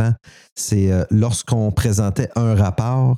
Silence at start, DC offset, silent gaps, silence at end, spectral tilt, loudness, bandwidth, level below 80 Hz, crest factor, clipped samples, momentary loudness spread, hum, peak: 0 s; under 0.1%; 0.52-0.56 s; 0 s; -6.5 dB/octave; -19 LUFS; 14.5 kHz; -38 dBFS; 12 dB; under 0.1%; 6 LU; none; -4 dBFS